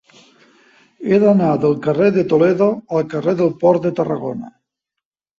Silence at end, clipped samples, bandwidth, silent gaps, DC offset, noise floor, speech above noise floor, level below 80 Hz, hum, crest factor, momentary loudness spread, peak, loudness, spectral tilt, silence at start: 0.9 s; under 0.1%; 7.4 kHz; none; under 0.1%; -83 dBFS; 68 dB; -58 dBFS; none; 16 dB; 9 LU; -2 dBFS; -16 LUFS; -9 dB/octave; 1 s